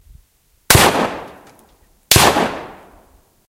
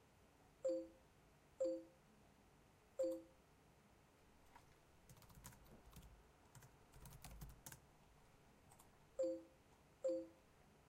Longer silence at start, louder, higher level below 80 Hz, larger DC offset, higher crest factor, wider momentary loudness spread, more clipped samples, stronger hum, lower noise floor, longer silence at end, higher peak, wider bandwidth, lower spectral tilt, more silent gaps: first, 0.7 s vs 0.2 s; first, -13 LUFS vs -49 LUFS; first, -34 dBFS vs -72 dBFS; neither; about the same, 18 dB vs 18 dB; second, 17 LU vs 22 LU; neither; neither; second, -56 dBFS vs -71 dBFS; first, 0.75 s vs 0.1 s; first, 0 dBFS vs -34 dBFS; about the same, 17 kHz vs 16 kHz; second, -3 dB/octave vs -5.5 dB/octave; neither